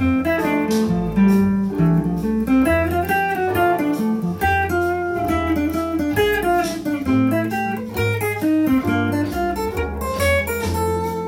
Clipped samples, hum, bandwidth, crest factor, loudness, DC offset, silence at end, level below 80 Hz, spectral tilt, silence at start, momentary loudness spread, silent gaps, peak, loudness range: under 0.1%; none; 17 kHz; 14 dB; -19 LUFS; under 0.1%; 0 s; -38 dBFS; -6.5 dB/octave; 0 s; 5 LU; none; -6 dBFS; 2 LU